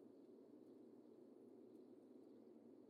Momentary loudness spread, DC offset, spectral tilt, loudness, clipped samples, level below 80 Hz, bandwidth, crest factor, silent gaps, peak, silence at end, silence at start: 1 LU; under 0.1%; -7.5 dB/octave; -65 LUFS; under 0.1%; under -90 dBFS; 4.8 kHz; 12 dB; none; -52 dBFS; 0 s; 0 s